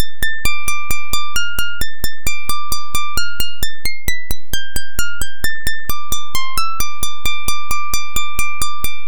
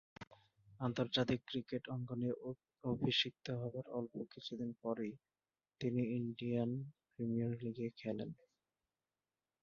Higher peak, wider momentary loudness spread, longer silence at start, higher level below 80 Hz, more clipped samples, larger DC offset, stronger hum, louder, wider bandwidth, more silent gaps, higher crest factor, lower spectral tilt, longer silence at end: first, 0 dBFS vs -22 dBFS; second, 4 LU vs 12 LU; second, 0 s vs 0.2 s; first, -30 dBFS vs -74 dBFS; neither; first, 40% vs under 0.1%; neither; first, -22 LUFS vs -41 LUFS; first, 19 kHz vs 7 kHz; second, none vs 0.27-0.31 s; about the same, 16 dB vs 20 dB; second, -1.5 dB/octave vs -5 dB/octave; second, 0 s vs 1.3 s